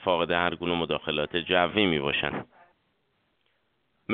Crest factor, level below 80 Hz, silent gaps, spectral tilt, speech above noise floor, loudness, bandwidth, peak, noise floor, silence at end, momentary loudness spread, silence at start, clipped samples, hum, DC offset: 22 dB; -56 dBFS; none; -2.5 dB/octave; 47 dB; -26 LUFS; 4.7 kHz; -6 dBFS; -73 dBFS; 0 s; 7 LU; 0 s; under 0.1%; none; under 0.1%